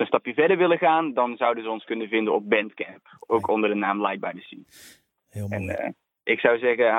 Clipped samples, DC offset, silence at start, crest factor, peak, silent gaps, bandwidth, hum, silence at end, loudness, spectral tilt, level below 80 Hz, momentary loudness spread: under 0.1%; under 0.1%; 0 s; 22 dB; -2 dBFS; none; 13.5 kHz; none; 0 s; -24 LUFS; -6.5 dB/octave; -66 dBFS; 15 LU